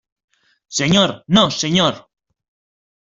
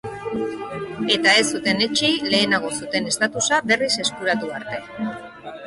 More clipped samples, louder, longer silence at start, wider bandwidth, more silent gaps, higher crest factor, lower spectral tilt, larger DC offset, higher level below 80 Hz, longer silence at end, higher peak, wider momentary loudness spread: neither; first, -16 LUFS vs -20 LUFS; first, 0.7 s vs 0.05 s; second, 7.8 kHz vs 11.5 kHz; neither; about the same, 18 dB vs 16 dB; first, -4 dB/octave vs -2.5 dB/octave; neither; first, -52 dBFS vs -58 dBFS; first, 1.2 s vs 0 s; first, -2 dBFS vs -6 dBFS; second, 8 LU vs 14 LU